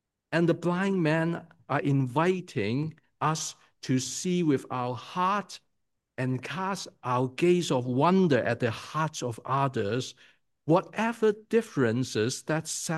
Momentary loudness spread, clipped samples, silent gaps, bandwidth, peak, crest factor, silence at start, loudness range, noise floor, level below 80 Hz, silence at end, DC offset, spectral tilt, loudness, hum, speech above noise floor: 8 LU; under 0.1%; none; 12.5 kHz; -10 dBFS; 18 dB; 0.3 s; 3 LU; -80 dBFS; -74 dBFS; 0 s; under 0.1%; -5.5 dB/octave; -28 LUFS; none; 52 dB